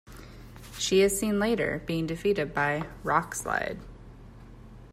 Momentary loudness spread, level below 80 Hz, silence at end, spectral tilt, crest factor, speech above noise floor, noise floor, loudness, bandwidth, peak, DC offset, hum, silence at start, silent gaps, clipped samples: 24 LU; -50 dBFS; 0 s; -4 dB/octave; 18 dB; 20 dB; -47 dBFS; -27 LUFS; 16 kHz; -10 dBFS; under 0.1%; none; 0.05 s; none; under 0.1%